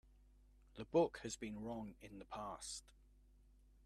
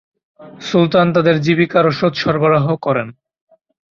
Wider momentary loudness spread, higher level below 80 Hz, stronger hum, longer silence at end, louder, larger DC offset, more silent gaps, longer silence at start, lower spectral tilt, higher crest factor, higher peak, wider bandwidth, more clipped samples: first, 18 LU vs 7 LU; second, -66 dBFS vs -54 dBFS; neither; about the same, 0.95 s vs 0.85 s; second, -44 LUFS vs -15 LUFS; neither; neither; second, 0.2 s vs 0.4 s; second, -4.5 dB/octave vs -7 dB/octave; first, 22 dB vs 14 dB; second, -24 dBFS vs -2 dBFS; first, 13.5 kHz vs 7.2 kHz; neither